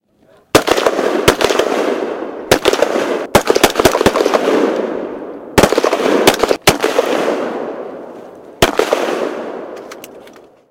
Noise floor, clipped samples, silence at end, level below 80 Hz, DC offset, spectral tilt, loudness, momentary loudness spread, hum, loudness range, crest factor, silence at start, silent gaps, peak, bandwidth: -50 dBFS; 0.4%; 0.4 s; -38 dBFS; under 0.1%; -3.5 dB/octave; -14 LUFS; 16 LU; none; 5 LU; 14 dB; 0.55 s; none; 0 dBFS; over 20 kHz